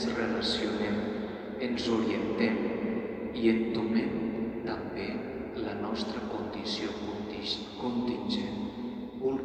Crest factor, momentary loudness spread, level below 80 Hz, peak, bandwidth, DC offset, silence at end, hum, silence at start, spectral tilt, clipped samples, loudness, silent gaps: 18 dB; 7 LU; -56 dBFS; -14 dBFS; 9 kHz; under 0.1%; 0 s; none; 0 s; -5.5 dB/octave; under 0.1%; -32 LUFS; none